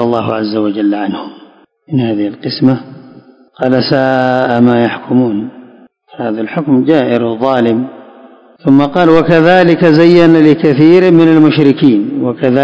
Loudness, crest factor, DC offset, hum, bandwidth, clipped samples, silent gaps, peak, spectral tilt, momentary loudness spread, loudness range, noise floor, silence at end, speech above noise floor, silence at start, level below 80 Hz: -10 LUFS; 10 dB; under 0.1%; none; 8 kHz; 2%; none; 0 dBFS; -8.5 dB/octave; 12 LU; 8 LU; -41 dBFS; 0 s; 32 dB; 0 s; -50 dBFS